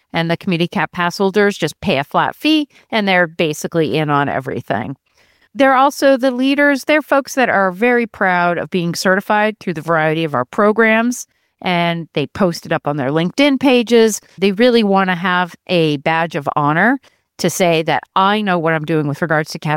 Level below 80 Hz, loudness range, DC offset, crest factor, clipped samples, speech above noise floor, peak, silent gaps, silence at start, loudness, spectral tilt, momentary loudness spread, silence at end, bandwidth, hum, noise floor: -56 dBFS; 2 LU; under 0.1%; 14 dB; under 0.1%; 40 dB; -2 dBFS; none; 0.15 s; -15 LUFS; -5 dB/octave; 8 LU; 0 s; 17 kHz; none; -55 dBFS